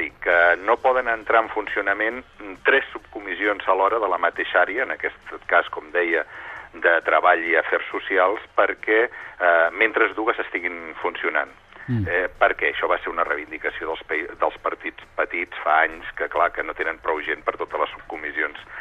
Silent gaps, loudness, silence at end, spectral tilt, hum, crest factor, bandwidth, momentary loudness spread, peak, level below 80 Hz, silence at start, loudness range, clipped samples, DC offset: none; -22 LUFS; 0 s; -6.5 dB/octave; none; 20 dB; 8 kHz; 11 LU; -2 dBFS; -54 dBFS; 0 s; 4 LU; under 0.1%; under 0.1%